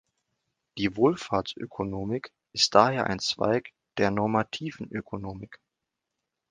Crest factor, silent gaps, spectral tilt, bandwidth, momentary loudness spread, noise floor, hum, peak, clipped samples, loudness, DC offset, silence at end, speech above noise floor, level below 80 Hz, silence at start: 26 dB; none; -4.5 dB/octave; 10 kHz; 16 LU; -85 dBFS; none; -2 dBFS; under 0.1%; -27 LUFS; under 0.1%; 0.95 s; 58 dB; -58 dBFS; 0.75 s